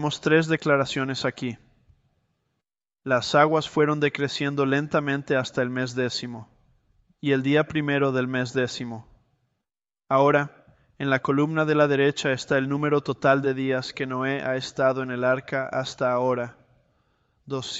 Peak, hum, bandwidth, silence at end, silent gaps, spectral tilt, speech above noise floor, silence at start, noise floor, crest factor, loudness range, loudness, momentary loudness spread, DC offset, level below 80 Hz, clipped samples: -4 dBFS; none; 8.2 kHz; 0 s; none; -5.5 dB/octave; 64 dB; 0 s; -88 dBFS; 20 dB; 3 LU; -24 LUFS; 11 LU; under 0.1%; -62 dBFS; under 0.1%